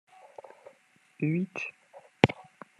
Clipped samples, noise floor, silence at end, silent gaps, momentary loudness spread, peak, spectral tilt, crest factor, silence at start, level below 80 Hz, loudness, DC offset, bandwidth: under 0.1%; -63 dBFS; 0.35 s; none; 24 LU; 0 dBFS; -7 dB/octave; 32 dB; 1.2 s; -66 dBFS; -30 LUFS; under 0.1%; 10.5 kHz